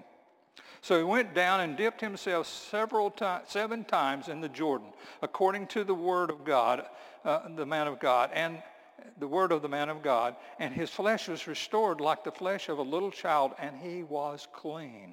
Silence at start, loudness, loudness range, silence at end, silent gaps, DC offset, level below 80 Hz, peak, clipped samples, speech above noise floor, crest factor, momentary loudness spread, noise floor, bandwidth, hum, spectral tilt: 0.55 s; -31 LUFS; 2 LU; 0 s; none; under 0.1%; -78 dBFS; -12 dBFS; under 0.1%; 31 dB; 20 dB; 12 LU; -62 dBFS; 17 kHz; none; -4.5 dB/octave